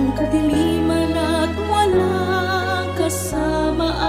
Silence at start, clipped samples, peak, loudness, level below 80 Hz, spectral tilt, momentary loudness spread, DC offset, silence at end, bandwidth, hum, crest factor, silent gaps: 0 s; under 0.1%; -6 dBFS; -19 LUFS; -34 dBFS; -5.5 dB/octave; 4 LU; under 0.1%; 0 s; 16 kHz; none; 12 dB; none